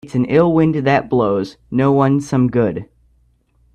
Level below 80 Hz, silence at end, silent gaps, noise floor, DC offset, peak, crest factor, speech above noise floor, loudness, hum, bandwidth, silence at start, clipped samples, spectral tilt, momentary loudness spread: -48 dBFS; 0.9 s; none; -57 dBFS; under 0.1%; 0 dBFS; 16 dB; 42 dB; -16 LUFS; none; 9.8 kHz; 0.05 s; under 0.1%; -8 dB/octave; 7 LU